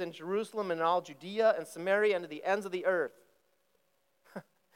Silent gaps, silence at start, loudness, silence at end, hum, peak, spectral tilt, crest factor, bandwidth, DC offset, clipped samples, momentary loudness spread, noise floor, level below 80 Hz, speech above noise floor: none; 0 s; -32 LUFS; 0.35 s; none; -16 dBFS; -5 dB/octave; 18 dB; 16.5 kHz; under 0.1%; under 0.1%; 17 LU; -76 dBFS; under -90 dBFS; 44 dB